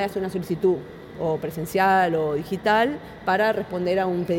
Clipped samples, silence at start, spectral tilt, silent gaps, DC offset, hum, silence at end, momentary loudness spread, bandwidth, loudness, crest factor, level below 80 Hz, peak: under 0.1%; 0 s; -6 dB/octave; none; under 0.1%; none; 0 s; 9 LU; 17 kHz; -23 LUFS; 16 dB; -54 dBFS; -8 dBFS